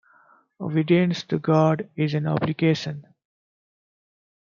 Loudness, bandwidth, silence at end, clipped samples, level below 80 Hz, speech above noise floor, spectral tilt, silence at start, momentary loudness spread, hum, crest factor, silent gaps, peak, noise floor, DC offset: -23 LUFS; 7.2 kHz; 1.5 s; under 0.1%; -64 dBFS; 36 dB; -7.5 dB/octave; 0.6 s; 10 LU; none; 18 dB; none; -6 dBFS; -58 dBFS; under 0.1%